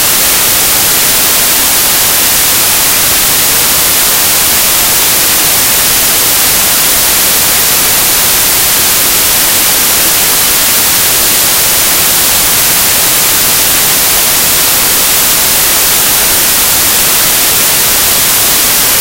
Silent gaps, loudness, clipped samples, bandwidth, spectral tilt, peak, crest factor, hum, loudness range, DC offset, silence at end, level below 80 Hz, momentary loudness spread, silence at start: none; -5 LUFS; 1%; over 20 kHz; 0 dB/octave; 0 dBFS; 8 dB; none; 0 LU; under 0.1%; 0 s; -32 dBFS; 0 LU; 0 s